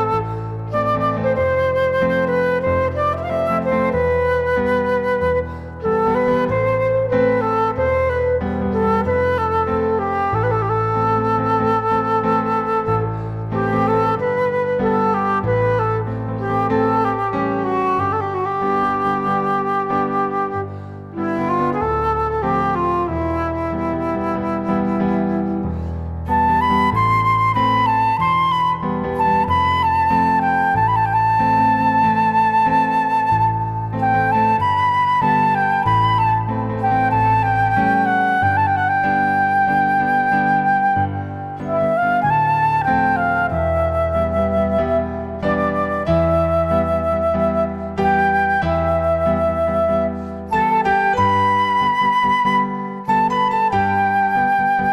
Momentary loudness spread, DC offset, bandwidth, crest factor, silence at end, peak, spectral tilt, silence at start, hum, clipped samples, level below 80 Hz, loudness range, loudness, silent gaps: 6 LU; under 0.1%; 12.5 kHz; 12 dB; 0 s; -6 dBFS; -8 dB/octave; 0 s; none; under 0.1%; -38 dBFS; 4 LU; -18 LUFS; none